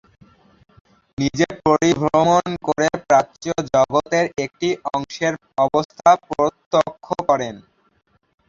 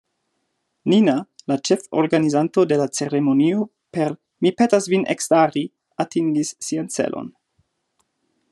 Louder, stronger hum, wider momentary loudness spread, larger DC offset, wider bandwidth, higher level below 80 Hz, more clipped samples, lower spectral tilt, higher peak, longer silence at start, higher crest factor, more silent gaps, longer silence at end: about the same, -19 LUFS vs -20 LUFS; neither; about the same, 8 LU vs 10 LU; neither; second, 7.6 kHz vs 12.5 kHz; first, -52 dBFS vs -70 dBFS; neither; about the same, -5 dB/octave vs -5.5 dB/octave; about the same, -2 dBFS vs -2 dBFS; first, 1.2 s vs 0.85 s; about the same, 18 dB vs 18 dB; first, 5.85-5.89 s, 6.66-6.71 s vs none; second, 0.9 s vs 1.25 s